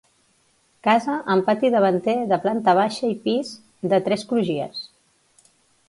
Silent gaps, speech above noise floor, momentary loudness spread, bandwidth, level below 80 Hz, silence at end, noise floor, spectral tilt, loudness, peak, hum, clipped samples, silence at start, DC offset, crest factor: none; 42 dB; 11 LU; 11.5 kHz; -68 dBFS; 1 s; -63 dBFS; -6 dB/octave; -21 LUFS; -6 dBFS; none; under 0.1%; 0.85 s; under 0.1%; 18 dB